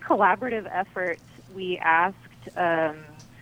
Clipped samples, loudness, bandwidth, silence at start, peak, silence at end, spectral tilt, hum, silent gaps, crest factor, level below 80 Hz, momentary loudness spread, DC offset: under 0.1%; -25 LUFS; 16 kHz; 0 s; -6 dBFS; 0.15 s; -6 dB/octave; none; none; 20 dB; -62 dBFS; 18 LU; under 0.1%